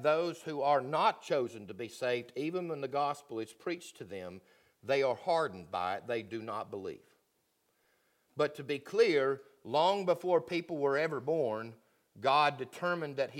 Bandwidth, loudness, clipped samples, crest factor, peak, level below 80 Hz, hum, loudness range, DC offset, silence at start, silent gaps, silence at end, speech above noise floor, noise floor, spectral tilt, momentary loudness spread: 16 kHz; -33 LUFS; under 0.1%; 18 dB; -14 dBFS; -82 dBFS; none; 7 LU; under 0.1%; 0 s; none; 0 s; 44 dB; -77 dBFS; -5 dB/octave; 15 LU